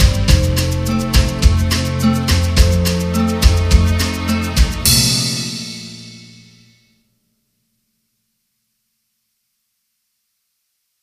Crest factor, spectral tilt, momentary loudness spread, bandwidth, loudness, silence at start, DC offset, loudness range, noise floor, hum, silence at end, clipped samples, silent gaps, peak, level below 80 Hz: 16 dB; -4.5 dB/octave; 11 LU; 15.5 kHz; -15 LUFS; 0 s; under 0.1%; 11 LU; -70 dBFS; none; 4.8 s; under 0.1%; none; 0 dBFS; -20 dBFS